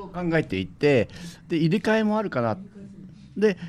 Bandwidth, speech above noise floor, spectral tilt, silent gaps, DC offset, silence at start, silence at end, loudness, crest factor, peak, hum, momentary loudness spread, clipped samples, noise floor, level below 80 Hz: 12.5 kHz; 21 dB; -7 dB/octave; none; under 0.1%; 0 s; 0 s; -24 LUFS; 16 dB; -8 dBFS; none; 19 LU; under 0.1%; -44 dBFS; -54 dBFS